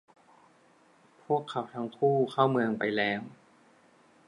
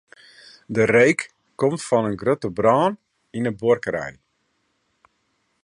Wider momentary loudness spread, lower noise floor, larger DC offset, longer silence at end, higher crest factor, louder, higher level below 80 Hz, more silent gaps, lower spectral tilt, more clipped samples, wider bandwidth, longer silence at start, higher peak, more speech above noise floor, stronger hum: second, 10 LU vs 16 LU; second, -62 dBFS vs -70 dBFS; neither; second, 0.95 s vs 1.55 s; about the same, 22 dB vs 18 dB; second, -29 LUFS vs -21 LUFS; second, -78 dBFS vs -58 dBFS; neither; about the same, -7 dB/octave vs -6 dB/octave; neither; about the same, 11 kHz vs 11 kHz; first, 1.3 s vs 0.7 s; second, -10 dBFS vs -4 dBFS; second, 34 dB vs 50 dB; neither